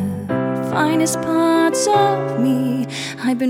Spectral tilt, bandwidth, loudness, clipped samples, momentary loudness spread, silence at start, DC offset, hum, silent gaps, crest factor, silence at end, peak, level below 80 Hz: -5 dB/octave; 16.5 kHz; -18 LUFS; under 0.1%; 7 LU; 0 s; under 0.1%; none; none; 14 dB; 0 s; -4 dBFS; -58 dBFS